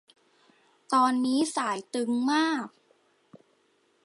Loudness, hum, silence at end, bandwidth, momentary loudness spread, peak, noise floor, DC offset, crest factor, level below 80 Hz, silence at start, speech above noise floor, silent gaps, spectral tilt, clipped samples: -27 LUFS; none; 1.35 s; 11.5 kHz; 7 LU; -12 dBFS; -68 dBFS; under 0.1%; 18 dB; -82 dBFS; 0.9 s; 42 dB; none; -3 dB/octave; under 0.1%